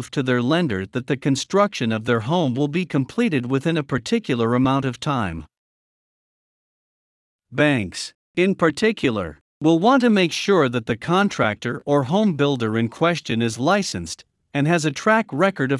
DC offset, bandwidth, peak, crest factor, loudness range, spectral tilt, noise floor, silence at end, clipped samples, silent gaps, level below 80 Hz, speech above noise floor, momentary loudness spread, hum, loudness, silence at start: under 0.1%; 12 kHz; -4 dBFS; 16 dB; 6 LU; -5.5 dB/octave; under -90 dBFS; 0 s; under 0.1%; 5.58-7.39 s, 8.15-8.34 s, 9.41-9.61 s; -56 dBFS; over 70 dB; 8 LU; none; -20 LUFS; 0 s